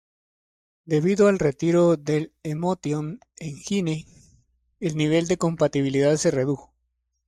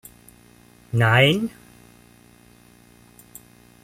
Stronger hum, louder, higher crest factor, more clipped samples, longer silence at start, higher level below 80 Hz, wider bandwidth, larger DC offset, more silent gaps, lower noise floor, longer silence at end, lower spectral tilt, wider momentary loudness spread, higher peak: second, none vs 60 Hz at -45 dBFS; second, -23 LUFS vs -19 LUFS; second, 16 dB vs 22 dB; neither; about the same, 0.85 s vs 0.95 s; about the same, -56 dBFS vs -56 dBFS; second, 12 kHz vs 15.5 kHz; neither; neither; first, -75 dBFS vs -52 dBFS; second, 0.7 s vs 2.35 s; about the same, -6 dB/octave vs -5.5 dB/octave; second, 13 LU vs 29 LU; second, -8 dBFS vs -4 dBFS